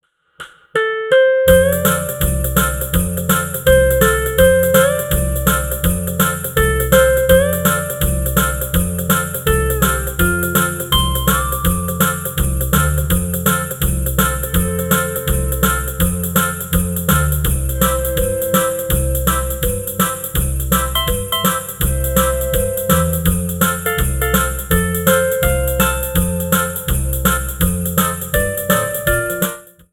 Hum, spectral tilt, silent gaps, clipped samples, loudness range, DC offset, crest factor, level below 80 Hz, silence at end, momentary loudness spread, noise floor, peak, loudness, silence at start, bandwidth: none; -4.5 dB/octave; none; under 0.1%; 3 LU; under 0.1%; 16 dB; -24 dBFS; 0.3 s; 6 LU; -38 dBFS; 0 dBFS; -16 LUFS; 0.4 s; 19.5 kHz